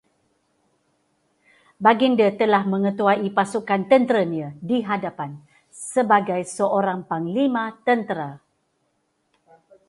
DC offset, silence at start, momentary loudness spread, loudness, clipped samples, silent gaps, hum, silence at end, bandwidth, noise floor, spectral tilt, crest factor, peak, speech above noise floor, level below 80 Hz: under 0.1%; 1.8 s; 12 LU; -21 LUFS; under 0.1%; none; none; 1.5 s; 11.5 kHz; -70 dBFS; -5.5 dB/octave; 22 dB; -2 dBFS; 50 dB; -70 dBFS